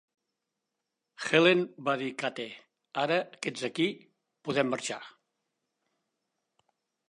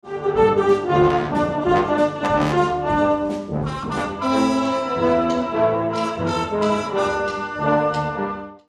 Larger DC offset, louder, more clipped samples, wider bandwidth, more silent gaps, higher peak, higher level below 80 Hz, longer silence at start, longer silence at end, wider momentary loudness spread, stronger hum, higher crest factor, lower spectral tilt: neither; second, -29 LUFS vs -20 LUFS; neither; about the same, 11 kHz vs 12 kHz; neither; second, -8 dBFS vs -4 dBFS; second, -82 dBFS vs -44 dBFS; first, 1.2 s vs 0.05 s; first, 2 s vs 0.1 s; first, 18 LU vs 8 LU; neither; first, 24 dB vs 16 dB; second, -4.5 dB/octave vs -6.5 dB/octave